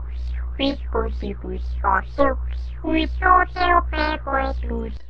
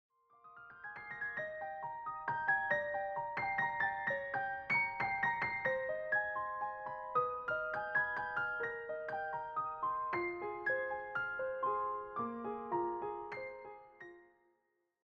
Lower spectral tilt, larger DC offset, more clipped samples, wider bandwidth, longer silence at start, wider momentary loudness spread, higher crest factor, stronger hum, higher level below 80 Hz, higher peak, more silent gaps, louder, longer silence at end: first, -8 dB/octave vs -3 dB/octave; neither; neither; second, 5.8 kHz vs 7.2 kHz; second, 0 s vs 0.45 s; about the same, 13 LU vs 11 LU; about the same, 20 dB vs 18 dB; first, 60 Hz at -30 dBFS vs none; first, -28 dBFS vs -72 dBFS; first, -2 dBFS vs -22 dBFS; neither; first, -22 LUFS vs -38 LUFS; second, 0 s vs 0.8 s